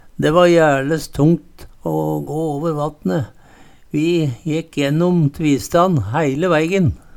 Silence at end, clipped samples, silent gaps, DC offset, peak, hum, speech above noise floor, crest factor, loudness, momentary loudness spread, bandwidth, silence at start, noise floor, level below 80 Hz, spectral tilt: 0.2 s; under 0.1%; none; under 0.1%; 0 dBFS; none; 28 dB; 18 dB; -17 LUFS; 9 LU; 18 kHz; 0.05 s; -44 dBFS; -42 dBFS; -6.5 dB/octave